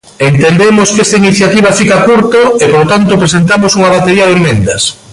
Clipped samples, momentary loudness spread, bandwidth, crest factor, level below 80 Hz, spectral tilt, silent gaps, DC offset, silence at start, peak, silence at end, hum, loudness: under 0.1%; 3 LU; 11.5 kHz; 6 dB; -36 dBFS; -4.5 dB/octave; none; under 0.1%; 0.2 s; 0 dBFS; 0 s; none; -6 LUFS